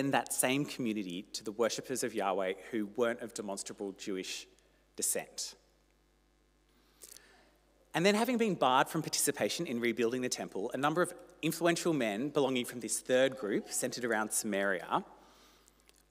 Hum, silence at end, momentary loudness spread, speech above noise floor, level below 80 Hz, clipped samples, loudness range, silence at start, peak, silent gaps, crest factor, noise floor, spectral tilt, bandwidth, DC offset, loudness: 50 Hz at -70 dBFS; 0.95 s; 11 LU; 37 dB; -72 dBFS; under 0.1%; 8 LU; 0 s; -12 dBFS; none; 22 dB; -70 dBFS; -3.5 dB/octave; 16 kHz; under 0.1%; -33 LUFS